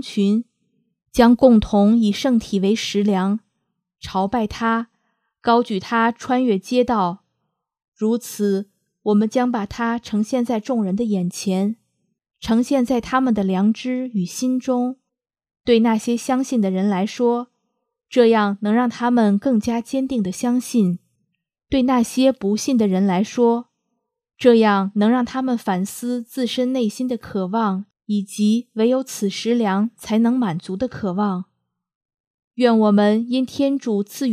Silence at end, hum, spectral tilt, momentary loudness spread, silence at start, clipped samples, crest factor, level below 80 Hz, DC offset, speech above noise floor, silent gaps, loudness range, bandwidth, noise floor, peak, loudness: 0 s; none; -6 dB/octave; 9 LU; 0.05 s; under 0.1%; 20 dB; -50 dBFS; under 0.1%; 58 dB; 7.88-7.92 s, 31.95-32.51 s; 4 LU; 14.5 kHz; -76 dBFS; 0 dBFS; -19 LUFS